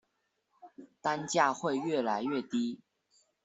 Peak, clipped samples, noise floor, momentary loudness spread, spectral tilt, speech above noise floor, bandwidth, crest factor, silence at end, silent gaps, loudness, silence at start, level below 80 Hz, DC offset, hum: -12 dBFS; under 0.1%; -80 dBFS; 9 LU; -4 dB/octave; 48 dB; 8.2 kHz; 22 dB; 0.7 s; none; -32 LUFS; 0.65 s; -78 dBFS; under 0.1%; none